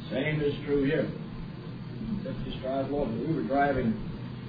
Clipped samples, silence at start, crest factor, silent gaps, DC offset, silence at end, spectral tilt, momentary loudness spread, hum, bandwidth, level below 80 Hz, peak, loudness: under 0.1%; 0 s; 16 dB; none; under 0.1%; 0 s; -10 dB/octave; 13 LU; none; 5 kHz; -46 dBFS; -14 dBFS; -31 LUFS